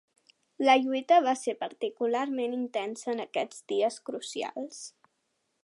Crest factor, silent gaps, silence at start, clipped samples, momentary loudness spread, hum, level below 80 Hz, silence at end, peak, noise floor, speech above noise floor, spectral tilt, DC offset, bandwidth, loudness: 20 dB; none; 0.6 s; under 0.1%; 14 LU; none; -88 dBFS; 0.75 s; -10 dBFS; -78 dBFS; 49 dB; -2.5 dB/octave; under 0.1%; 11.5 kHz; -29 LUFS